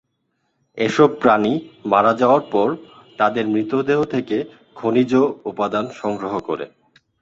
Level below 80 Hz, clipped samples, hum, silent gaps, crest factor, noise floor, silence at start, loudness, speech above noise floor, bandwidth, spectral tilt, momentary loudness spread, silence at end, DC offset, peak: -60 dBFS; under 0.1%; none; none; 18 dB; -71 dBFS; 0.75 s; -19 LUFS; 52 dB; 7.8 kHz; -6.5 dB/octave; 11 LU; 0.55 s; under 0.1%; -2 dBFS